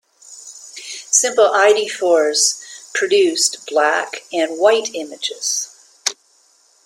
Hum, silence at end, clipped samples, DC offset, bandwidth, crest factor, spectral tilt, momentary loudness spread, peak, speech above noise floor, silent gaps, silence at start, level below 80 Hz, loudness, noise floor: none; 0.7 s; under 0.1%; under 0.1%; 16.5 kHz; 18 dB; 0.5 dB/octave; 17 LU; 0 dBFS; 39 dB; none; 0.3 s; -72 dBFS; -16 LUFS; -56 dBFS